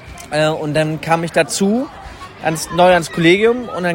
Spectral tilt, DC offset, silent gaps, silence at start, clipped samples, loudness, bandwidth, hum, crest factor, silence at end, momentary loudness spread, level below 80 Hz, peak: -5 dB/octave; under 0.1%; none; 0 s; under 0.1%; -15 LUFS; 16.5 kHz; none; 16 dB; 0 s; 11 LU; -44 dBFS; 0 dBFS